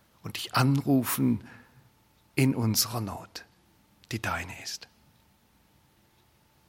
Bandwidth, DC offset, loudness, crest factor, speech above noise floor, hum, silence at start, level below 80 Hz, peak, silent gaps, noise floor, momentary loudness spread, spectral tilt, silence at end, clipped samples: 16.5 kHz; under 0.1%; -28 LUFS; 22 dB; 37 dB; none; 0.25 s; -64 dBFS; -8 dBFS; none; -64 dBFS; 16 LU; -4.5 dB/octave; 1.9 s; under 0.1%